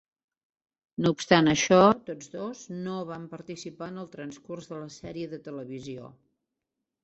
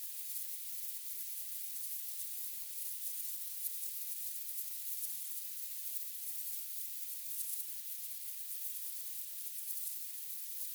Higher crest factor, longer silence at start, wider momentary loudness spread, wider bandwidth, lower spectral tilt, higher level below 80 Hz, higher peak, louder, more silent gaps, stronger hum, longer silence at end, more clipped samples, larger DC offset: first, 26 dB vs 18 dB; first, 1 s vs 0 s; first, 20 LU vs 2 LU; second, 8.2 kHz vs over 20 kHz; first, -5 dB/octave vs 9 dB/octave; first, -62 dBFS vs under -90 dBFS; first, -4 dBFS vs -24 dBFS; first, -25 LUFS vs -39 LUFS; neither; neither; first, 0.95 s vs 0 s; neither; neither